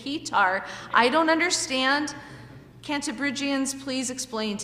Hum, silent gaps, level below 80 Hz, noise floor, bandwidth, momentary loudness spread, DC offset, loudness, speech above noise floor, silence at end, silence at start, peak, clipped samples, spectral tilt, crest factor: none; none; -60 dBFS; -45 dBFS; 15.5 kHz; 13 LU; under 0.1%; -24 LUFS; 20 dB; 0 s; 0 s; -4 dBFS; under 0.1%; -2 dB/octave; 22 dB